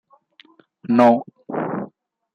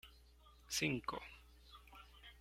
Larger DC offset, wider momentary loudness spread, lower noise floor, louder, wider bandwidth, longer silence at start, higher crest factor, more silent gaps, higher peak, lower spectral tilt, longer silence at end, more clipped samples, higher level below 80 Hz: neither; second, 20 LU vs 23 LU; second, -53 dBFS vs -65 dBFS; first, -19 LUFS vs -41 LUFS; second, 7 kHz vs 16.5 kHz; first, 0.85 s vs 0.05 s; about the same, 22 dB vs 24 dB; neither; first, 0 dBFS vs -24 dBFS; first, -8 dB/octave vs -3 dB/octave; first, 0.45 s vs 0 s; neither; about the same, -68 dBFS vs -64 dBFS